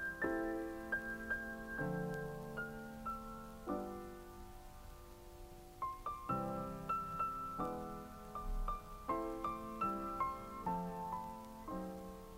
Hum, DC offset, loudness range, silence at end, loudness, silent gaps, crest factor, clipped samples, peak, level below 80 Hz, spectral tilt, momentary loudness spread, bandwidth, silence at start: none; under 0.1%; 6 LU; 0 s; -43 LUFS; none; 18 dB; under 0.1%; -26 dBFS; -54 dBFS; -6.5 dB/octave; 15 LU; 16 kHz; 0 s